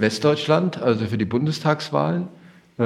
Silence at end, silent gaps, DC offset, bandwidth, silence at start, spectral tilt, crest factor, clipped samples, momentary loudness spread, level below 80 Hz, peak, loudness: 0 s; none; under 0.1%; 13 kHz; 0 s; -6.5 dB/octave; 18 dB; under 0.1%; 5 LU; -66 dBFS; -2 dBFS; -21 LUFS